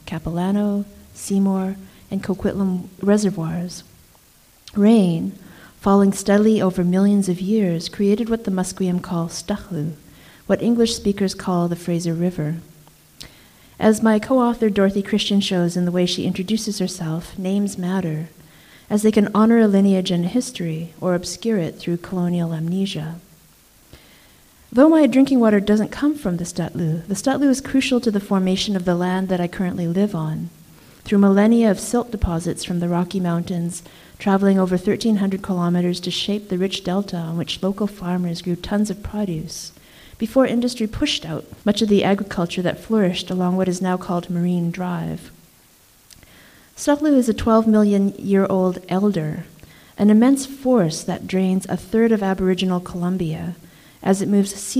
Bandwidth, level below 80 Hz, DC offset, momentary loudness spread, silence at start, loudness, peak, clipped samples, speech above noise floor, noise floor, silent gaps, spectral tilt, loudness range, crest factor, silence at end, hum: 15.5 kHz; -46 dBFS; under 0.1%; 11 LU; 0.05 s; -20 LUFS; 0 dBFS; under 0.1%; 34 dB; -53 dBFS; none; -6 dB/octave; 5 LU; 18 dB; 0 s; none